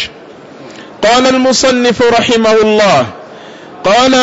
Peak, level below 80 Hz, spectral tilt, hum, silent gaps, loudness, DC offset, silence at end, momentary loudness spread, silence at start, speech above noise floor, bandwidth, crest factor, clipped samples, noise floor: -2 dBFS; -44 dBFS; -3.5 dB/octave; none; none; -9 LUFS; under 0.1%; 0 s; 13 LU; 0 s; 25 dB; 8 kHz; 10 dB; under 0.1%; -33 dBFS